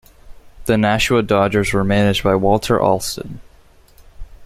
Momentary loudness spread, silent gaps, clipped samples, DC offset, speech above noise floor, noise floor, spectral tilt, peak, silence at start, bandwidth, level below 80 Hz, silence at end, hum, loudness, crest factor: 11 LU; none; under 0.1%; under 0.1%; 32 dB; -48 dBFS; -5.5 dB/octave; -2 dBFS; 0.25 s; 16 kHz; -36 dBFS; 0 s; none; -16 LUFS; 16 dB